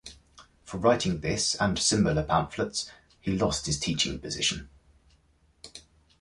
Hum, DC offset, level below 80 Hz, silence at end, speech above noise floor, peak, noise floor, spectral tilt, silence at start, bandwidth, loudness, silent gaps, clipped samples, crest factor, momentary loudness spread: none; under 0.1%; -48 dBFS; 0.4 s; 37 dB; -10 dBFS; -64 dBFS; -3.5 dB/octave; 0.05 s; 11.5 kHz; -27 LUFS; none; under 0.1%; 20 dB; 16 LU